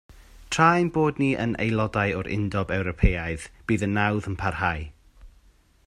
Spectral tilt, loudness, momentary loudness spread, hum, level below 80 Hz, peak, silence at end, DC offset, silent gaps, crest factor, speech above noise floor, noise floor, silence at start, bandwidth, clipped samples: -6 dB/octave; -25 LUFS; 10 LU; none; -36 dBFS; -4 dBFS; 0.55 s; under 0.1%; none; 20 dB; 34 dB; -58 dBFS; 0.1 s; 12 kHz; under 0.1%